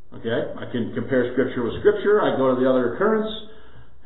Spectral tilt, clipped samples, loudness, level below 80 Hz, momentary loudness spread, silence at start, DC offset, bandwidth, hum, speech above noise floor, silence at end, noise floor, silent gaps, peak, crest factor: -11 dB/octave; under 0.1%; -22 LUFS; -52 dBFS; 9 LU; 0.1 s; 2%; 4.1 kHz; none; 27 dB; 0.25 s; -48 dBFS; none; -4 dBFS; 18 dB